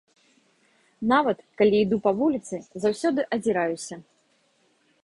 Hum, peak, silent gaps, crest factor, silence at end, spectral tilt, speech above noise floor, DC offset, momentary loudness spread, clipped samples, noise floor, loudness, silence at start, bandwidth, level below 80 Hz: none; -6 dBFS; none; 18 dB; 1.05 s; -5.5 dB/octave; 42 dB; under 0.1%; 13 LU; under 0.1%; -66 dBFS; -24 LUFS; 1 s; 11.5 kHz; -62 dBFS